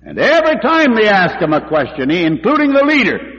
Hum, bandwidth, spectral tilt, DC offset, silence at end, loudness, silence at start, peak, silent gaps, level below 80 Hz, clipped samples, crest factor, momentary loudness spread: none; 7.6 kHz; -6 dB/octave; under 0.1%; 0 s; -12 LUFS; 0.05 s; -2 dBFS; none; -46 dBFS; under 0.1%; 10 dB; 6 LU